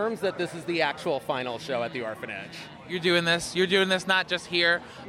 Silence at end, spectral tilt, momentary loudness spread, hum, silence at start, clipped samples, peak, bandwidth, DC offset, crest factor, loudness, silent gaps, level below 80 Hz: 0 s; -4 dB/octave; 12 LU; none; 0 s; under 0.1%; -10 dBFS; 15 kHz; under 0.1%; 18 dB; -26 LUFS; none; -64 dBFS